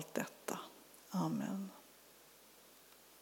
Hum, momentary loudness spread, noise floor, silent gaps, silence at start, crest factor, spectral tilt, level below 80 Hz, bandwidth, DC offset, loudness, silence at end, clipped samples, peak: none; 21 LU; -63 dBFS; none; 0 s; 24 dB; -5.5 dB/octave; -86 dBFS; over 20 kHz; under 0.1%; -43 LUFS; 0 s; under 0.1%; -22 dBFS